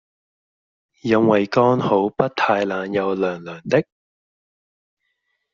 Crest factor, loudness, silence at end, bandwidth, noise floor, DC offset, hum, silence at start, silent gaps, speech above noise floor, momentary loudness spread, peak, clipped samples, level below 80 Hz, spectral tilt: 18 dB; -19 LUFS; 1.7 s; 7.2 kHz; -73 dBFS; under 0.1%; none; 1.05 s; none; 54 dB; 8 LU; -2 dBFS; under 0.1%; -62 dBFS; -5 dB/octave